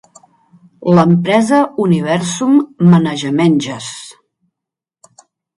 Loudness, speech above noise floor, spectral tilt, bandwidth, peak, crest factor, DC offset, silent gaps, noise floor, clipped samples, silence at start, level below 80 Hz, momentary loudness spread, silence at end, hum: -13 LUFS; 71 dB; -6.5 dB/octave; 11.5 kHz; 0 dBFS; 14 dB; under 0.1%; none; -83 dBFS; under 0.1%; 0.8 s; -58 dBFS; 13 LU; 1.45 s; none